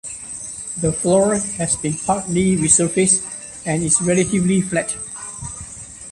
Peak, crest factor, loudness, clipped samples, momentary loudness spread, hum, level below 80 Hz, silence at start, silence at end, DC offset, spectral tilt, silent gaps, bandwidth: -2 dBFS; 18 dB; -18 LUFS; under 0.1%; 15 LU; none; -46 dBFS; 0.05 s; 0 s; under 0.1%; -4.5 dB/octave; none; 11.5 kHz